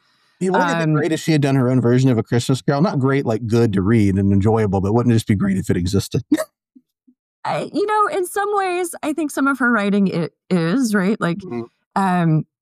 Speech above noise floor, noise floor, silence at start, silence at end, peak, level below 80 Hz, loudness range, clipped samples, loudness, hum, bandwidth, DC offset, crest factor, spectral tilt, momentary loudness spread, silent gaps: 37 dB; -55 dBFS; 0.4 s; 0.2 s; -4 dBFS; -50 dBFS; 4 LU; under 0.1%; -18 LUFS; none; 15.5 kHz; under 0.1%; 14 dB; -6.5 dB/octave; 7 LU; 7.19-7.43 s, 11.86-11.91 s